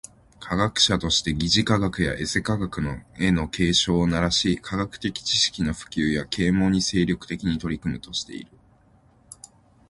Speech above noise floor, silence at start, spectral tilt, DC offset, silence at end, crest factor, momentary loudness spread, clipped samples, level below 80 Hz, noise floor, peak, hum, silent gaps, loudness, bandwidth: 34 dB; 0.4 s; -4 dB/octave; under 0.1%; 1.45 s; 20 dB; 10 LU; under 0.1%; -42 dBFS; -57 dBFS; -4 dBFS; none; none; -23 LUFS; 11.5 kHz